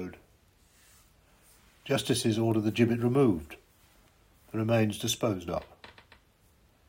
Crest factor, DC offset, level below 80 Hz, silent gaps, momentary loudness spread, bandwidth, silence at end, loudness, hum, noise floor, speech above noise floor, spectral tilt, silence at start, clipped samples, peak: 20 dB; under 0.1%; -60 dBFS; none; 20 LU; 16 kHz; 1 s; -29 LUFS; none; -64 dBFS; 36 dB; -5.5 dB/octave; 0 s; under 0.1%; -10 dBFS